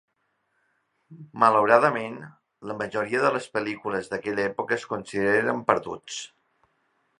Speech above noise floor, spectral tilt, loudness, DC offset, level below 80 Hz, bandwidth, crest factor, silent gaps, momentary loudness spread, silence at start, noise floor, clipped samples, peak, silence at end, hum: 49 dB; -5 dB/octave; -24 LUFS; under 0.1%; -66 dBFS; 11 kHz; 24 dB; none; 17 LU; 1.1 s; -74 dBFS; under 0.1%; -2 dBFS; 0.95 s; none